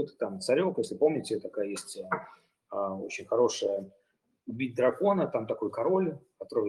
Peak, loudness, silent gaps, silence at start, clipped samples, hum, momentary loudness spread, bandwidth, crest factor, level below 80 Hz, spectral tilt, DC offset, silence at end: -12 dBFS; -30 LUFS; none; 0 s; under 0.1%; none; 11 LU; 12.5 kHz; 18 dB; -76 dBFS; -5.5 dB/octave; under 0.1%; 0 s